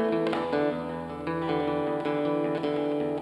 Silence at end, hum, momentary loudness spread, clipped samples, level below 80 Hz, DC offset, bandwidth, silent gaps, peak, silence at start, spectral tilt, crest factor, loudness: 0 s; none; 6 LU; under 0.1%; -60 dBFS; under 0.1%; 11.5 kHz; none; -12 dBFS; 0 s; -7.5 dB/octave; 16 dB; -29 LUFS